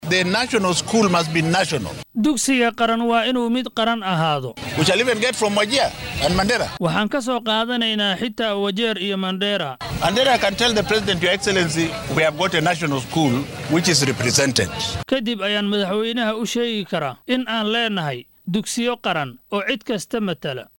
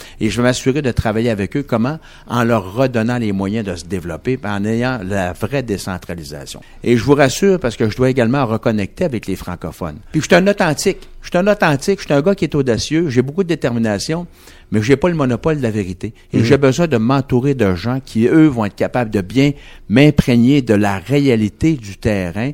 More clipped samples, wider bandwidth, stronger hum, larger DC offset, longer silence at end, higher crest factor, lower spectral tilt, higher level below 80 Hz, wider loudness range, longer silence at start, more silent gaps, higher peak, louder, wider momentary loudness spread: neither; about the same, 17 kHz vs 17 kHz; neither; neither; first, 0.15 s vs 0 s; about the same, 16 dB vs 16 dB; second, -4 dB/octave vs -6.5 dB/octave; second, -46 dBFS vs -38 dBFS; about the same, 3 LU vs 4 LU; about the same, 0 s vs 0 s; neither; second, -4 dBFS vs 0 dBFS; second, -20 LUFS vs -16 LUFS; second, 7 LU vs 12 LU